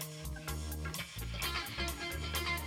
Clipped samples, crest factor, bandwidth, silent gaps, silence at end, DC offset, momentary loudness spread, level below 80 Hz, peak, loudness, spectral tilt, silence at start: under 0.1%; 18 dB; 16.5 kHz; none; 0 s; under 0.1%; 5 LU; -44 dBFS; -22 dBFS; -39 LUFS; -3 dB/octave; 0 s